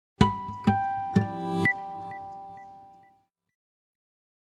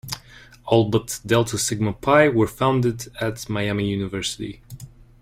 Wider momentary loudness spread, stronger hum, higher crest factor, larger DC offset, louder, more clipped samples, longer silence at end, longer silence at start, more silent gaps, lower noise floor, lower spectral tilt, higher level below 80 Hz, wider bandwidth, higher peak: about the same, 18 LU vs 17 LU; neither; first, 26 dB vs 20 dB; neither; second, -27 LUFS vs -21 LUFS; neither; first, 1.6 s vs 0.35 s; first, 0.2 s vs 0.05 s; neither; first, -65 dBFS vs -41 dBFS; first, -7 dB/octave vs -5 dB/octave; about the same, -48 dBFS vs -48 dBFS; second, 11.5 kHz vs 16.5 kHz; about the same, -4 dBFS vs -2 dBFS